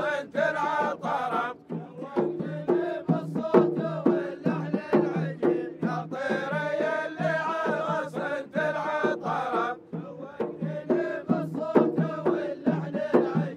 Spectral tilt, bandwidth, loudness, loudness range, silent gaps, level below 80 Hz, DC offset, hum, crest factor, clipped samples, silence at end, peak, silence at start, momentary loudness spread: -8 dB/octave; 10 kHz; -28 LUFS; 3 LU; none; -74 dBFS; under 0.1%; none; 22 dB; under 0.1%; 0 s; -4 dBFS; 0 s; 8 LU